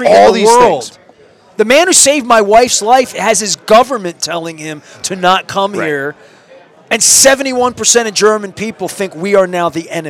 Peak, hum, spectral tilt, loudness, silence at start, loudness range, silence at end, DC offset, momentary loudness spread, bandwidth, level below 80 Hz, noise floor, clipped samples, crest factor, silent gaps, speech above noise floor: 0 dBFS; none; -2 dB/octave; -10 LUFS; 0 s; 5 LU; 0 s; under 0.1%; 14 LU; over 20 kHz; -48 dBFS; -43 dBFS; 0.9%; 12 dB; none; 33 dB